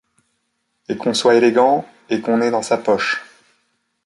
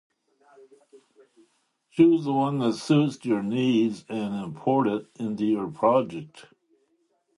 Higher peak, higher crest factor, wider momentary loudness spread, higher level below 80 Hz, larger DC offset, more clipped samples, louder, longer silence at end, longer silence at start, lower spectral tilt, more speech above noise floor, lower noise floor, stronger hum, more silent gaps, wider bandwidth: first, -2 dBFS vs -6 dBFS; about the same, 18 dB vs 20 dB; about the same, 11 LU vs 12 LU; about the same, -64 dBFS vs -68 dBFS; neither; neither; first, -17 LUFS vs -25 LUFS; second, 0.8 s vs 0.95 s; second, 0.9 s vs 1.95 s; second, -4 dB/octave vs -7 dB/octave; first, 54 dB vs 46 dB; about the same, -70 dBFS vs -70 dBFS; neither; neither; about the same, 11.5 kHz vs 11.5 kHz